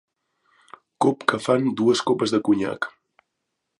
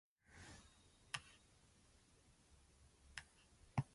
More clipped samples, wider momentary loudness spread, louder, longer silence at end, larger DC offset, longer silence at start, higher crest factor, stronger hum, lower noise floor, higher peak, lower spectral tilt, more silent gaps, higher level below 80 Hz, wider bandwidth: neither; second, 7 LU vs 21 LU; first, -22 LUFS vs -53 LUFS; first, 0.9 s vs 0 s; neither; first, 1 s vs 0.3 s; second, 22 dB vs 30 dB; neither; first, -79 dBFS vs -72 dBFS; first, -2 dBFS vs -24 dBFS; about the same, -5 dB/octave vs -4.5 dB/octave; neither; about the same, -66 dBFS vs -70 dBFS; about the same, 11.5 kHz vs 11.5 kHz